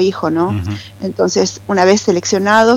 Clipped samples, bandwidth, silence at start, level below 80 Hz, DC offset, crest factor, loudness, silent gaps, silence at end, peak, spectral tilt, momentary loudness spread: under 0.1%; 15.5 kHz; 0 s; -48 dBFS; under 0.1%; 14 dB; -15 LUFS; none; 0 s; 0 dBFS; -4.5 dB/octave; 12 LU